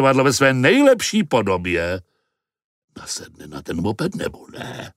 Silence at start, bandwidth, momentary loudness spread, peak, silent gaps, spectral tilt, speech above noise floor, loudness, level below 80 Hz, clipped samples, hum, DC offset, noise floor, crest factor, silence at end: 0 s; 16 kHz; 19 LU; 0 dBFS; 2.64-2.88 s; -4.5 dB/octave; 57 dB; -18 LUFS; -50 dBFS; under 0.1%; none; under 0.1%; -76 dBFS; 20 dB; 0.05 s